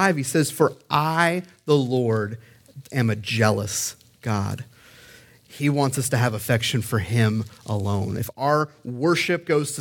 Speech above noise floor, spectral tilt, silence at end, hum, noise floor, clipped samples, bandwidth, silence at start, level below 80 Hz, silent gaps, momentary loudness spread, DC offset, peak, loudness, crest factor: 27 dB; -5 dB/octave; 0 s; none; -50 dBFS; under 0.1%; 18 kHz; 0 s; -58 dBFS; none; 9 LU; under 0.1%; -4 dBFS; -23 LUFS; 20 dB